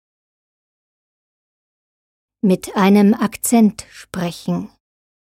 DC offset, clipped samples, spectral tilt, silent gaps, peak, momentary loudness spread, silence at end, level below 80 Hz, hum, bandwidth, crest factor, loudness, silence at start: under 0.1%; under 0.1%; -6 dB/octave; none; -2 dBFS; 15 LU; 0.65 s; -56 dBFS; none; 16 kHz; 18 dB; -17 LUFS; 2.45 s